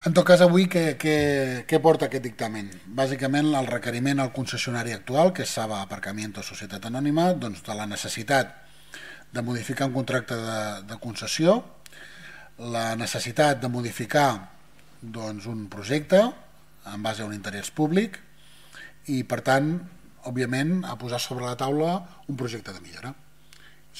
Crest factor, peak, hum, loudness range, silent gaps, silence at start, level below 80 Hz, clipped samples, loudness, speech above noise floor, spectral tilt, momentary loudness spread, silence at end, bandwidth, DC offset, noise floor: 22 dB; -4 dBFS; none; 4 LU; none; 0 s; -62 dBFS; under 0.1%; -25 LUFS; 29 dB; -5 dB/octave; 18 LU; 0 s; 16 kHz; 0.3%; -54 dBFS